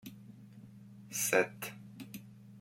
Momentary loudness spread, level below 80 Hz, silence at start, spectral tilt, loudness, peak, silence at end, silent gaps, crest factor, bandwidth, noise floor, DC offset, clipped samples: 24 LU; -78 dBFS; 0.05 s; -3 dB/octave; -34 LUFS; -14 dBFS; 0 s; none; 24 dB; 16.5 kHz; -54 dBFS; under 0.1%; under 0.1%